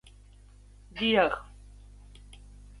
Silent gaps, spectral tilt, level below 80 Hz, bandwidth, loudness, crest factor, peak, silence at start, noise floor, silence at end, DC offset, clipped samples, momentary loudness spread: none; -5.5 dB/octave; -52 dBFS; 11.5 kHz; -27 LUFS; 24 dB; -10 dBFS; 0.95 s; -53 dBFS; 0.45 s; under 0.1%; under 0.1%; 28 LU